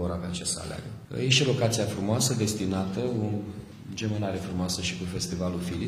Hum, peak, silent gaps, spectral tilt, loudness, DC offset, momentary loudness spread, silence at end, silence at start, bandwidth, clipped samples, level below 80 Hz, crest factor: none; -6 dBFS; none; -4.5 dB/octave; -28 LUFS; under 0.1%; 13 LU; 0 s; 0 s; 15.5 kHz; under 0.1%; -52 dBFS; 22 dB